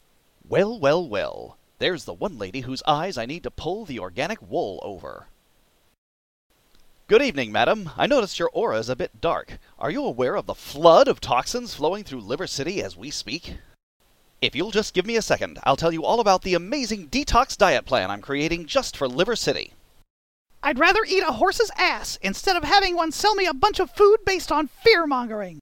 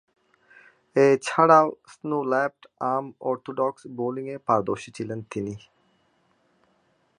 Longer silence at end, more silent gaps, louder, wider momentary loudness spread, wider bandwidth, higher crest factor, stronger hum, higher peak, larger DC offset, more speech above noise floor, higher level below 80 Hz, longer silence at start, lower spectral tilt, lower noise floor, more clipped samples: second, 0 s vs 1.6 s; first, 5.98-6.50 s, 13.83-14.00 s, 20.10-20.45 s vs none; about the same, -22 LUFS vs -24 LUFS; about the same, 13 LU vs 15 LU; first, 17 kHz vs 11 kHz; about the same, 22 dB vs 22 dB; neither; about the same, -2 dBFS vs -4 dBFS; neither; second, 39 dB vs 43 dB; first, -44 dBFS vs -68 dBFS; second, 0.5 s vs 0.95 s; second, -3.5 dB/octave vs -6 dB/octave; second, -62 dBFS vs -67 dBFS; neither